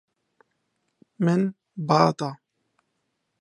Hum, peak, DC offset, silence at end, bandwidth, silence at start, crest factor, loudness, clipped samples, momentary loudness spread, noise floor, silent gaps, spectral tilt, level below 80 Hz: none; -2 dBFS; under 0.1%; 1.05 s; 10.5 kHz; 1.2 s; 24 dB; -24 LUFS; under 0.1%; 13 LU; -76 dBFS; none; -7 dB/octave; -72 dBFS